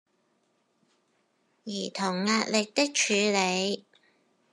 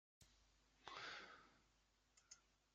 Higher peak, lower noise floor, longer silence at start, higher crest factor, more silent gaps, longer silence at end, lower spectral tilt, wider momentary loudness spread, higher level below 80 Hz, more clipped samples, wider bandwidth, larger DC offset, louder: first, -8 dBFS vs -34 dBFS; second, -72 dBFS vs -81 dBFS; first, 1.65 s vs 0.2 s; second, 22 dB vs 28 dB; neither; first, 0.75 s vs 0 s; first, -3 dB/octave vs 0.5 dB/octave; about the same, 13 LU vs 13 LU; about the same, -84 dBFS vs -84 dBFS; neither; first, 12 kHz vs 8 kHz; neither; first, -27 LUFS vs -59 LUFS